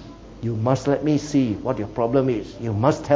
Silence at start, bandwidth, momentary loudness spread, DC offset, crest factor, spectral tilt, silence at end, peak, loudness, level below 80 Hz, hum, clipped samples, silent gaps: 0 s; 7.8 kHz; 8 LU; under 0.1%; 18 dB; -7.5 dB/octave; 0 s; -4 dBFS; -22 LUFS; -46 dBFS; none; under 0.1%; none